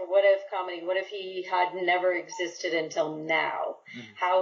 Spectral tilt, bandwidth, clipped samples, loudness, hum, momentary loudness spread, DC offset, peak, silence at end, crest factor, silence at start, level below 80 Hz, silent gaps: -1 dB/octave; 7.4 kHz; under 0.1%; -28 LUFS; none; 11 LU; under 0.1%; -12 dBFS; 0 s; 16 dB; 0 s; under -90 dBFS; none